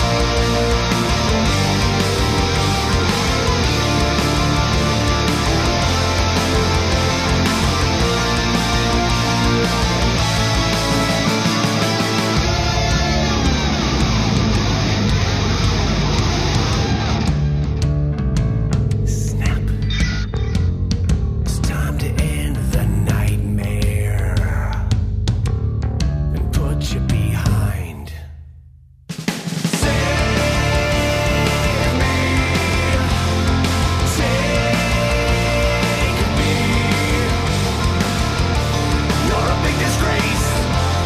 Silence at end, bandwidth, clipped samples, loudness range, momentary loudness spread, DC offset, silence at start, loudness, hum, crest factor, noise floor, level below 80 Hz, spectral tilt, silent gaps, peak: 0 s; 15.5 kHz; under 0.1%; 3 LU; 4 LU; under 0.1%; 0 s; -18 LUFS; none; 12 dB; -44 dBFS; -24 dBFS; -5 dB/octave; none; -4 dBFS